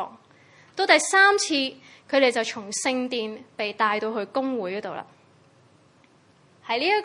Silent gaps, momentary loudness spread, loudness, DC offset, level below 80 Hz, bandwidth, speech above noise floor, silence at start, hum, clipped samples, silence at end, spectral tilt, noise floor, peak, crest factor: none; 17 LU; -23 LUFS; under 0.1%; -80 dBFS; 11.5 kHz; 34 dB; 0 s; none; under 0.1%; 0 s; -1.5 dB/octave; -58 dBFS; -2 dBFS; 22 dB